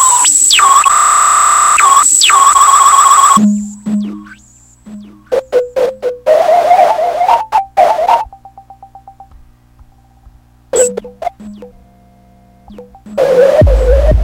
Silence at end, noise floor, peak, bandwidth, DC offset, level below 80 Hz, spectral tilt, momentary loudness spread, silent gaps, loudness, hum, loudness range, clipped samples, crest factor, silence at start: 0 s; -44 dBFS; 0 dBFS; over 20 kHz; under 0.1%; -22 dBFS; -2.5 dB/octave; 13 LU; none; -8 LUFS; 60 Hz at -50 dBFS; 15 LU; 0.5%; 10 dB; 0 s